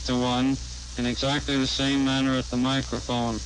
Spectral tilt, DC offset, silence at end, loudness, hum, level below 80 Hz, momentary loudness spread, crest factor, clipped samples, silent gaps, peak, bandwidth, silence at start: -4.5 dB/octave; under 0.1%; 0 s; -25 LUFS; none; -40 dBFS; 6 LU; 10 dB; under 0.1%; none; -14 dBFS; 10.5 kHz; 0 s